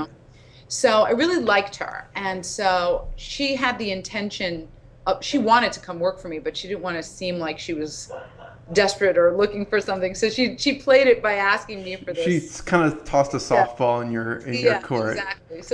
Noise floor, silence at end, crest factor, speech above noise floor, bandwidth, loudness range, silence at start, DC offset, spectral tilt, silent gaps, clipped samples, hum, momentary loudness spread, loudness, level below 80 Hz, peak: -48 dBFS; 0 s; 18 dB; 26 dB; 11 kHz; 5 LU; 0 s; under 0.1%; -4 dB/octave; none; under 0.1%; none; 12 LU; -22 LUFS; -46 dBFS; -4 dBFS